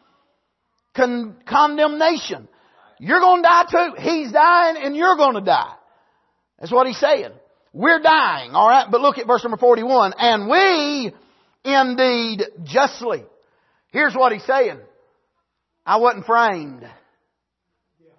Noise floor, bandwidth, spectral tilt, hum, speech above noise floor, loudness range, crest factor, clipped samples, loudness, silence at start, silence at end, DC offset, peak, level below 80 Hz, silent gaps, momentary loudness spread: -76 dBFS; 6.2 kHz; -4 dB/octave; none; 60 dB; 5 LU; 16 dB; under 0.1%; -17 LUFS; 0.95 s; 1.3 s; under 0.1%; -2 dBFS; -68 dBFS; none; 14 LU